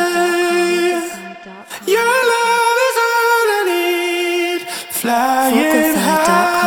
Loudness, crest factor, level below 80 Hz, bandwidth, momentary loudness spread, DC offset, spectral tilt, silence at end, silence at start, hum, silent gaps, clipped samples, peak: -15 LUFS; 14 dB; -58 dBFS; over 20 kHz; 9 LU; under 0.1%; -3 dB/octave; 0 s; 0 s; none; none; under 0.1%; 0 dBFS